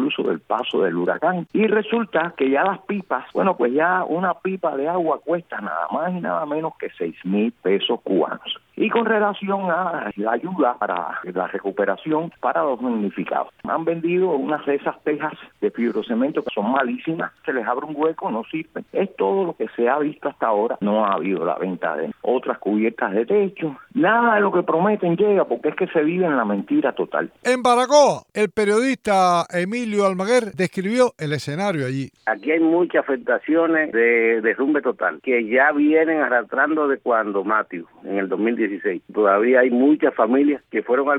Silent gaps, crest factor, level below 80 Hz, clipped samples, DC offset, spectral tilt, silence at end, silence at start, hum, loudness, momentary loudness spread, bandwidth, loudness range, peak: none; 18 dB; -68 dBFS; under 0.1%; under 0.1%; -5.5 dB/octave; 0 s; 0 s; none; -21 LUFS; 9 LU; 12 kHz; 5 LU; -2 dBFS